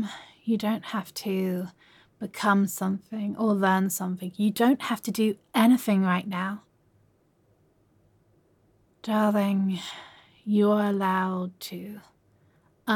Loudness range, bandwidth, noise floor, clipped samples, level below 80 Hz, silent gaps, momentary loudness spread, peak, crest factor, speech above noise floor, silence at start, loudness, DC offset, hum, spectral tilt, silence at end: 6 LU; 17.5 kHz; -65 dBFS; under 0.1%; -76 dBFS; none; 16 LU; -10 dBFS; 18 dB; 40 dB; 0 s; -26 LUFS; under 0.1%; none; -5.5 dB/octave; 0 s